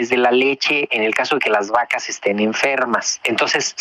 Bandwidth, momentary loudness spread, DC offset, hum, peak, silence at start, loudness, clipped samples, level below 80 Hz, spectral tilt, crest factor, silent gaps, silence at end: 14 kHz; 4 LU; under 0.1%; none; -4 dBFS; 0 s; -17 LUFS; under 0.1%; -64 dBFS; -2 dB/octave; 14 dB; none; 0 s